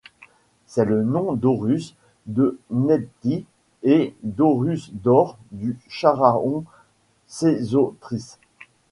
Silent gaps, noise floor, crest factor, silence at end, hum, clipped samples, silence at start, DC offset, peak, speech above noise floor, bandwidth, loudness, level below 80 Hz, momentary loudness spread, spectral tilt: none; -60 dBFS; 22 dB; 0.65 s; none; under 0.1%; 0.7 s; under 0.1%; 0 dBFS; 39 dB; 11.5 kHz; -22 LUFS; -58 dBFS; 11 LU; -8 dB/octave